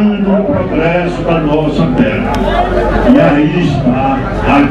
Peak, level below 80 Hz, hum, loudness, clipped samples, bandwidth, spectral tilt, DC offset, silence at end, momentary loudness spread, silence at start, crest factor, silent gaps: 0 dBFS; -22 dBFS; none; -11 LUFS; 0.2%; 9.8 kHz; -8 dB/octave; under 0.1%; 0 s; 5 LU; 0 s; 10 dB; none